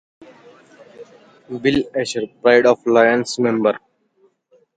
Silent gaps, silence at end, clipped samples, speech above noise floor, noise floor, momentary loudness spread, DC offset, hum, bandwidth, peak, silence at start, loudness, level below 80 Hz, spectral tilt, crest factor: none; 1 s; under 0.1%; 43 dB; -60 dBFS; 10 LU; under 0.1%; none; 9.2 kHz; 0 dBFS; 1 s; -17 LUFS; -56 dBFS; -4.5 dB/octave; 18 dB